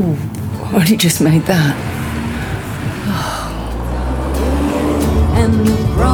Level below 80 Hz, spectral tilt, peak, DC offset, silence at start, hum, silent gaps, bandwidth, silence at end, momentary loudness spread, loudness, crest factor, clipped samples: -22 dBFS; -5.5 dB/octave; 0 dBFS; under 0.1%; 0 s; none; none; 20 kHz; 0 s; 10 LU; -16 LUFS; 14 dB; under 0.1%